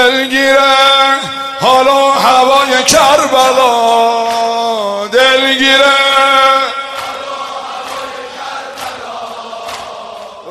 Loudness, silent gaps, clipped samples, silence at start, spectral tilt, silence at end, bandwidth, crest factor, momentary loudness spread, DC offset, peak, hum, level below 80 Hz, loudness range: -9 LUFS; none; 0.2%; 0 s; -1.5 dB/octave; 0 s; 14.5 kHz; 10 dB; 17 LU; under 0.1%; 0 dBFS; none; -50 dBFS; 14 LU